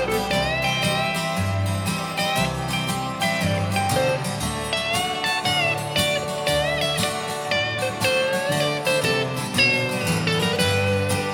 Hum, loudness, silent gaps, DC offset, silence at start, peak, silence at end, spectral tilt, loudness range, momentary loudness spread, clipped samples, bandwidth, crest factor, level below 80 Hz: none; -22 LUFS; none; under 0.1%; 0 s; -6 dBFS; 0 s; -4 dB/octave; 2 LU; 4 LU; under 0.1%; 18 kHz; 16 dB; -46 dBFS